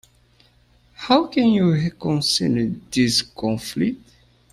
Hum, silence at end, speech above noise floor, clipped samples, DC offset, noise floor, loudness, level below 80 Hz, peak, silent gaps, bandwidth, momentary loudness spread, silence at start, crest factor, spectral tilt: 60 Hz at -40 dBFS; 0.55 s; 37 dB; under 0.1%; under 0.1%; -57 dBFS; -20 LUFS; -52 dBFS; -4 dBFS; none; 13.5 kHz; 8 LU; 1 s; 18 dB; -5 dB/octave